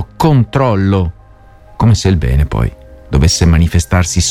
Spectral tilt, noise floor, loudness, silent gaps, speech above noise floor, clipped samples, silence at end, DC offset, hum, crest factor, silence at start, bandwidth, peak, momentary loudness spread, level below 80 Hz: -5.5 dB/octave; -40 dBFS; -12 LUFS; none; 29 dB; under 0.1%; 0 s; under 0.1%; none; 12 dB; 0 s; 14 kHz; 0 dBFS; 7 LU; -20 dBFS